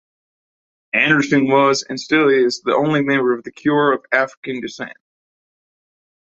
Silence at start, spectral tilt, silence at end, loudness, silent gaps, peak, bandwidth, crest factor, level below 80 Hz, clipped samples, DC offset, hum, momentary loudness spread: 0.95 s; -5 dB/octave; 1.4 s; -17 LUFS; 4.37-4.43 s; -2 dBFS; 8 kHz; 18 dB; -64 dBFS; under 0.1%; under 0.1%; none; 13 LU